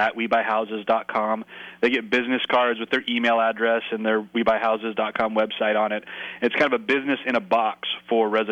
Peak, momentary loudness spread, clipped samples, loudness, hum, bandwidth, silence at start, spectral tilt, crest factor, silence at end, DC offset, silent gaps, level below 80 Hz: -8 dBFS; 5 LU; under 0.1%; -23 LUFS; none; 9 kHz; 0 s; -5.5 dB/octave; 14 dB; 0 s; under 0.1%; none; -64 dBFS